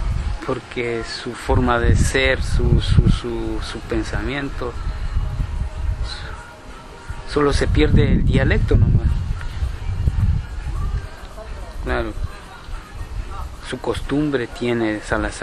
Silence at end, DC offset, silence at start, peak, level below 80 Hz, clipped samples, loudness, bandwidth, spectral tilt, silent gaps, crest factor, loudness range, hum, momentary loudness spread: 0 s; under 0.1%; 0 s; 0 dBFS; -24 dBFS; under 0.1%; -21 LUFS; 12 kHz; -6.5 dB/octave; none; 20 dB; 9 LU; none; 18 LU